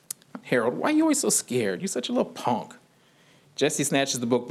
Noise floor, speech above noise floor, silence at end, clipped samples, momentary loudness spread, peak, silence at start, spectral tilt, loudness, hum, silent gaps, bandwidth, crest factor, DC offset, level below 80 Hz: -59 dBFS; 34 dB; 0 s; under 0.1%; 12 LU; -8 dBFS; 0.35 s; -3.5 dB/octave; -25 LUFS; none; none; 15.5 kHz; 18 dB; under 0.1%; -74 dBFS